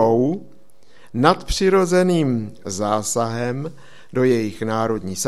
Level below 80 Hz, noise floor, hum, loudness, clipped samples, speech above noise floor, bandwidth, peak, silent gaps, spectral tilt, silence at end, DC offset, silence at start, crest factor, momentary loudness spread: -42 dBFS; -54 dBFS; none; -20 LUFS; under 0.1%; 34 dB; 14.5 kHz; 0 dBFS; none; -5 dB/octave; 0 s; 1%; 0 s; 20 dB; 12 LU